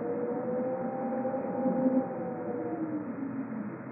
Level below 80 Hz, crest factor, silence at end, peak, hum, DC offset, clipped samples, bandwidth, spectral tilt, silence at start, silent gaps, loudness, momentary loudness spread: -76 dBFS; 16 dB; 0 s; -16 dBFS; none; under 0.1%; under 0.1%; 2.7 kHz; -5.5 dB/octave; 0 s; none; -33 LUFS; 8 LU